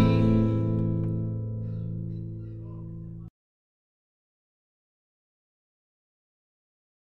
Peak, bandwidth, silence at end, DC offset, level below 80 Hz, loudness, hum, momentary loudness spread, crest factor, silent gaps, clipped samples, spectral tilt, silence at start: -10 dBFS; 4.9 kHz; 3.85 s; under 0.1%; -44 dBFS; -28 LUFS; none; 18 LU; 22 dB; none; under 0.1%; -10.5 dB/octave; 0 s